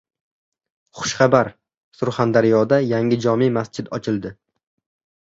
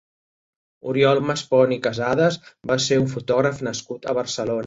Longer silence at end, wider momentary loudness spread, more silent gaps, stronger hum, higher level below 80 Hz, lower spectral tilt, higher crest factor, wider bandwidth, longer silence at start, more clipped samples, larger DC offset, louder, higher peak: first, 1 s vs 0 s; about the same, 11 LU vs 10 LU; first, 1.84-1.92 s vs none; neither; about the same, -58 dBFS vs -58 dBFS; about the same, -6 dB/octave vs -5 dB/octave; about the same, 18 dB vs 18 dB; about the same, 7.8 kHz vs 8 kHz; about the same, 0.95 s vs 0.85 s; neither; neither; about the same, -19 LUFS vs -21 LUFS; about the same, -2 dBFS vs -4 dBFS